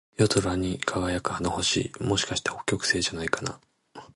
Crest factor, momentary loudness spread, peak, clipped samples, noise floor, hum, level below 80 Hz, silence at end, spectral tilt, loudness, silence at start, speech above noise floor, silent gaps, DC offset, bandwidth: 22 dB; 5 LU; -6 dBFS; under 0.1%; -49 dBFS; none; -46 dBFS; 0.1 s; -3.5 dB/octave; -27 LUFS; 0.2 s; 22 dB; none; under 0.1%; 11.5 kHz